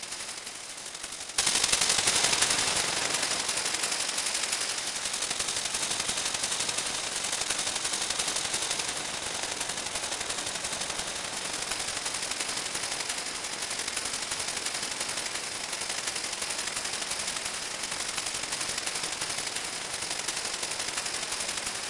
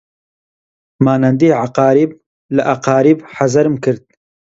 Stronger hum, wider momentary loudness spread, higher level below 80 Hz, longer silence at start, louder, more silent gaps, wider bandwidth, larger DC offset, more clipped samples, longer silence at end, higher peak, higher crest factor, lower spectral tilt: neither; about the same, 8 LU vs 7 LU; about the same, -60 dBFS vs -56 dBFS; second, 0 s vs 1 s; second, -29 LUFS vs -14 LUFS; second, none vs 2.26-2.49 s; first, 11.5 kHz vs 8 kHz; neither; neither; second, 0 s vs 0.6 s; second, -4 dBFS vs 0 dBFS; first, 28 dB vs 14 dB; second, 0.5 dB/octave vs -7.5 dB/octave